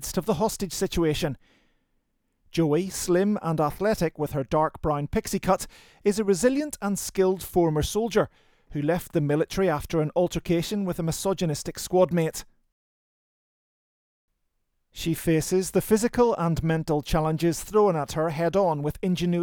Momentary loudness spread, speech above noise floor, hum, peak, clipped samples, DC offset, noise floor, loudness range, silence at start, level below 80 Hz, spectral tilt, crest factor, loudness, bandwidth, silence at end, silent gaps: 6 LU; 50 dB; none; -8 dBFS; under 0.1%; under 0.1%; -74 dBFS; 5 LU; 0 s; -46 dBFS; -5.5 dB/octave; 18 dB; -25 LUFS; over 20 kHz; 0 s; 12.72-14.28 s